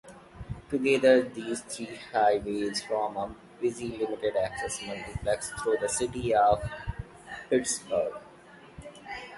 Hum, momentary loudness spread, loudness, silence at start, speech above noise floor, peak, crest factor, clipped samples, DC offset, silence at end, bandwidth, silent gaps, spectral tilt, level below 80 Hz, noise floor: none; 19 LU; -29 LUFS; 0.05 s; 24 dB; -8 dBFS; 22 dB; under 0.1%; under 0.1%; 0 s; 11.5 kHz; none; -4 dB/octave; -50 dBFS; -52 dBFS